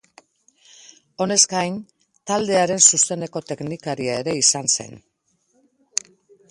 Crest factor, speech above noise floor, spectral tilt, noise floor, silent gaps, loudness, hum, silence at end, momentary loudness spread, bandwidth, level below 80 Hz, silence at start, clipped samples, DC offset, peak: 22 dB; 47 dB; -2 dB/octave; -68 dBFS; none; -19 LUFS; none; 1.5 s; 16 LU; 11.5 kHz; -64 dBFS; 1.2 s; under 0.1%; under 0.1%; 0 dBFS